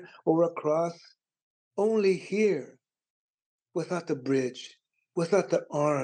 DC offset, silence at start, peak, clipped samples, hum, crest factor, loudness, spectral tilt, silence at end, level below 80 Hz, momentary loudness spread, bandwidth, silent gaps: under 0.1%; 0 s; -12 dBFS; under 0.1%; none; 18 dB; -28 LUFS; -6.5 dB/octave; 0 s; -90 dBFS; 12 LU; 9.4 kHz; 1.42-1.71 s, 3.10-3.59 s